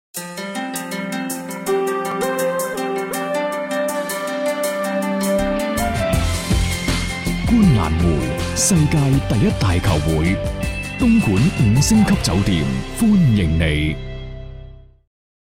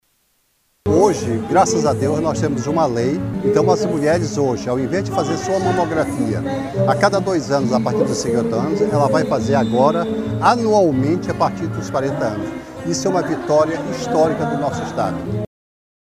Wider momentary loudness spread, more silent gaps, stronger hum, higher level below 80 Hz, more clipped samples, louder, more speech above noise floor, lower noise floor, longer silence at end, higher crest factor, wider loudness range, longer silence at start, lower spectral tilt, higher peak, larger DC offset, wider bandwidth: first, 10 LU vs 7 LU; neither; neither; first, -30 dBFS vs -46 dBFS; neither; about the same, -19 LUFS vs -18 LUFS; second, 23 dB vs 46 dB; second, -39 dBFS vs -63 dBFS; about the same, 0.75 s vs 0.7 s; about the same, 14 dB vs 16 dB; about the same, 5 LU vs 3 LU; second, 0.15 s vs 0.85 s; about the same, -5.5 dB/octave vs -6 dB/octave; second, -4 dBFS vs 0 dBFS; neither; about the same, 16.5 kHz vs 15.5 kHz